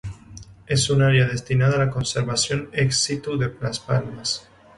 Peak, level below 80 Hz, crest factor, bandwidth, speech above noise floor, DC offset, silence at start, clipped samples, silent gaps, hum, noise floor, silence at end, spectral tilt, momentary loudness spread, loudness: -6 dBFS; -46 dBFS; 16 dB; 11.5 kHz; 22 dB; under 0.1%; 0.05 s; under 0.1%; none; none; -43 dBFS; 0.35 s; -4.5 dB/octave; 9 LU; -22 LUFS